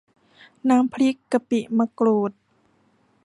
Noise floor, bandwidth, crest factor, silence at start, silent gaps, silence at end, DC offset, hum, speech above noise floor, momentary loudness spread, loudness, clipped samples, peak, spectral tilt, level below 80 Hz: -63 dBFS; 11.5 kHz; 16 dB; 0.65 s; none; 0.95 s; under 0.1%; none; 42 dB; 6 LU; -22 LUFS; under 0.1%; -8 dBFS; -6.5 dB/octave; -70 dBFS